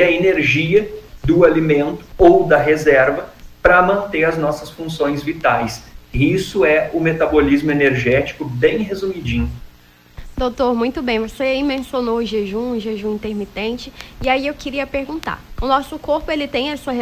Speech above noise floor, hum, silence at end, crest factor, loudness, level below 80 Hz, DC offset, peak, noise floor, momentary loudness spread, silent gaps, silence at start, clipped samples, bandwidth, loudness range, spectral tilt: 29 dB; none; 0 s; 16 dB; -17 LUFS; -36 dBFS; under 0.1%; 0 dBFS; -46 dBFS; 12 LU; none; 0 s; under 0.1%; 16 kHz; 8 LU; -6 dB/octave